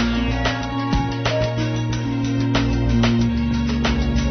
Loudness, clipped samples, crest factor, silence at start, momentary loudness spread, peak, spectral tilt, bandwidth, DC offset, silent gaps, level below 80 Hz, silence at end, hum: -21 LUFS; under 0.1%; 16 dB; 0 s; 4 LU; -4 dBFS; -6.5 dB/octave; 6.6 kHz; under 0.1%; none; -28 dBFS; 0 s; none